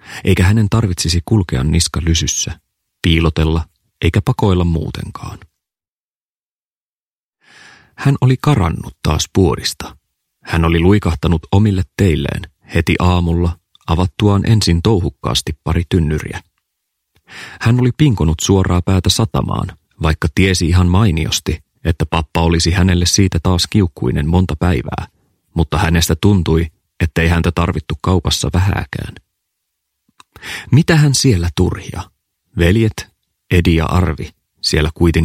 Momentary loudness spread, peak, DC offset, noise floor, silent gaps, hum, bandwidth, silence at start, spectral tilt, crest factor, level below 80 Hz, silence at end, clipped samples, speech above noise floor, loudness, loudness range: 13 LU; 0 dBFS; under 0.1%; under -90 dBFS; 5.88-7.33 s; none; 15.5 kHz; 0.05 s; -5.5 dB/octave; 16 dB; -28 dBFS; 0 s; under 0.1%; over 76 dB; -15 LUFS; 4 LU